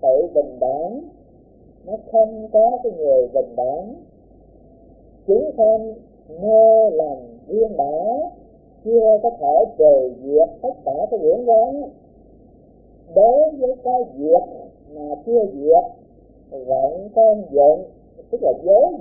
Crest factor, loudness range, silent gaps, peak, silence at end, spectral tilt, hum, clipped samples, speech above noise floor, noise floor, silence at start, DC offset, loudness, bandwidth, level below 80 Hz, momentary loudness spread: 16 dB; 3 LU; none; -2 dBFS; 0 s; -16 dB/octave; none; under 0.1%; 32 dB; -48 dBFS; 0.05 s; under 0.1%; -17 LUFS; 0.9 kHz; -52 dBFS; 16 LU